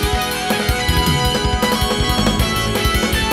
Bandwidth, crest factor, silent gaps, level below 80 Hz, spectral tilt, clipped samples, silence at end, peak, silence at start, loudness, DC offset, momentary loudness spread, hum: 16.5 kHz; 14 dB; none; -24 dBFS; -4 dB/octave; under 0.1%; 0 s; -2 dBFS; 0 s; -17 LUFS; under 0.1%; 2 LU; none